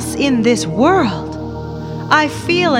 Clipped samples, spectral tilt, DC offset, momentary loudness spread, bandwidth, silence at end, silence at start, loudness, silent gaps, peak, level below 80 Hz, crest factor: under 0.1%; -5 dB/octave; under 0.1%; 13 LU; 16 kHz; 0 s; 0 s; -15 LUFS; none; 0 dBFS; -38 dBFS; 16 dB